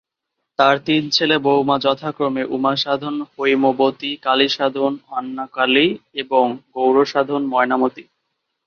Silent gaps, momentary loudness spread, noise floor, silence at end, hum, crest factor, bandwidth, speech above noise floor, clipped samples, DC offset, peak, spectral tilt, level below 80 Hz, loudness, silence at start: none; 7 LU; -78 dBFS; 0.65 s; none; 18 dB; 7 kHz; 60 dB; under 0.1%; under 0.1%; -2 dBFS; -5 dB/octave; -64 dBFS; -18 LUFS; 0.6 s